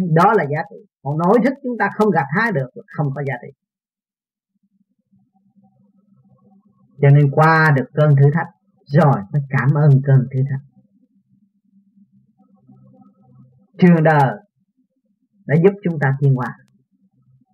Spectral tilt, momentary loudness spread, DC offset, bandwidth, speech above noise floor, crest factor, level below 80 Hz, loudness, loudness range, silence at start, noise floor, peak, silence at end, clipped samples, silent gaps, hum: -9.5 dB/octave; 13 LU; under 0.1%; 5.6 kHz; over 75 dB; 18 dB; -66 dBFS; -16 LUFS; 11 LU; 0 s; under -90 dBFS; 0 dBFS; 1 s; under 0.1%; none; none